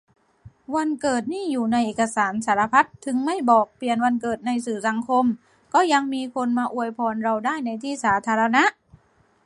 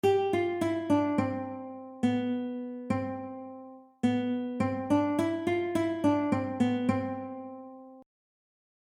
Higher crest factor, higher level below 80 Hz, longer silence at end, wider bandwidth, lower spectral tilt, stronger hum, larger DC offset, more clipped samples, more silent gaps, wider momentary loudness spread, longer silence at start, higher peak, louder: about the same, 20 dB vs 16 dB; about the same, -64 dBFS vs -66 dBFS; second, 0.75 s vs 0.95 s; second, 11.5 kHz vs 14 kHz; second, -4 dB/octave vs -7 dB/octave; neither; neither; neither; neither; second, 7 LU vs 16 LU; first, 0.45 s vs 0.05 s; first, -4 dBFS vs -14 dBFS; first, -22 LUFS vs -30 LUFS